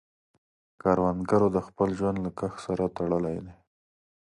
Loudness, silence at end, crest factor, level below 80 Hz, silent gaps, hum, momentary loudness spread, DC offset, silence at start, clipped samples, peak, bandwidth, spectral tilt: -28 LUFS; 0.7 s; 20 dB; -52 dBFS; none; none; 9 LU; under 0.1%; 0.85 s; under 0.1%; -8 dBFS; 11 kHz; -8.5 dB/octave